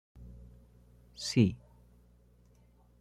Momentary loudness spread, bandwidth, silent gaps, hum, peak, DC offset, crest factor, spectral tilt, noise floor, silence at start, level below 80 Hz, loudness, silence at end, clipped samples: 27 LU; 12.5 kHz; none; 60 Hz at -50 dBFS; -12 dBFS; under 0.1%; 24 dB; -6 dB/octave; -63 dBFS; 0.2 s; -58 dBFS; -31 LUFS; 1.45 s; under 0.1%